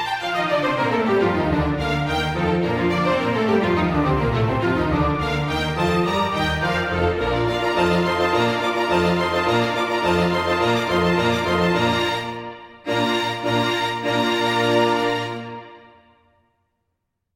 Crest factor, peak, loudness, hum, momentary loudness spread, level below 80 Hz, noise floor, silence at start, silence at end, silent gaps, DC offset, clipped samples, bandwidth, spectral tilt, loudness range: 14 dB; -6 dBFS; -20 LUFS; none; 4 LU; -40 dBFS; -76 dBFS; 0 s; 1.55 s; none; under 0.1%; under 0.1%; 16.5 kHz; -6 dB/octave; 2 LU